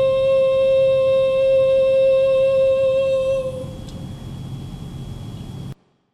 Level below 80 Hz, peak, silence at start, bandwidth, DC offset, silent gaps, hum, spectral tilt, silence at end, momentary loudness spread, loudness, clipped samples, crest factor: -44 dBFS; -10 dBFS; 0 s; 10 kHz; under 0.1%; none; none; -6.5 dB/octave; 0.4 s; 18 LU; -17 LUFS; under 0.1%; 8 dB